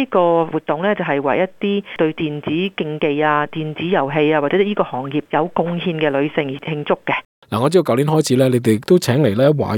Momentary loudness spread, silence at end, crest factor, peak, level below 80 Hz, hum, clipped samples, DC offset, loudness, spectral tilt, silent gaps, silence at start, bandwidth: 7 LU; 0 s; 16 dB; -2 dBFS; -58 dBFS; none; under 0.1%; under 0.1%; -18 LUFS; -6.5 dB/octave; 7.25-7.42 s; 0 s; 17.5 kHz